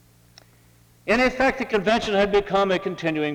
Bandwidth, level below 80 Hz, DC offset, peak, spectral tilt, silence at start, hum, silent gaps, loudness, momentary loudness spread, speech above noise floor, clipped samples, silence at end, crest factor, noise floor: 16.5 kHz; -46 dBFS; under 0.1%; -6 dBFS; -5 dB/octave; 1.05 s; none; none; -21 LUFS; 5 LU; 34 dB; under 0.1%; 0 s; 16 dB; -55 dBFS